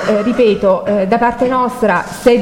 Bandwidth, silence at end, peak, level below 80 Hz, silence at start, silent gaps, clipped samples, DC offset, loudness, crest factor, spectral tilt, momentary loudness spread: 16.5 kHz; 0 s; 0 dBFS; -42 dBFS; 0 s; none; under 0.1%; under 0.1%; -13 LUFS; 12 dB; -6 dB/octave; 3 LU